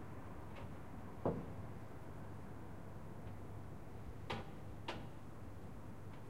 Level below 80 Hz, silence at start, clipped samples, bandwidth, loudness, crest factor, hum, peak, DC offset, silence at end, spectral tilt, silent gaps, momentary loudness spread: -60 dBFS; 0 s; under 0.1%; 16 kHz; -50 LUFS; 24 dB; none; -26 dBFS; 0.3%; 0 s; -7 dB/octave; none; 10 LU